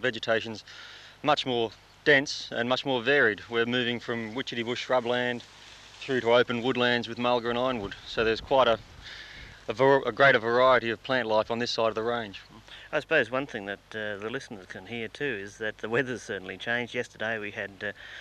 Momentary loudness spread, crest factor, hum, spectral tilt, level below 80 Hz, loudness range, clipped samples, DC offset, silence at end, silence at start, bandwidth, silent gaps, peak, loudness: 19 LU; 20 dB; 50 Hz at -60 dBFS; -4.5 dB/octave; -58 dBFS; 7 LU; under 0.1%; under 0.1%; 0 s; 0 s; 12.5 kHz; none; -8 dBFS; -27 LUFS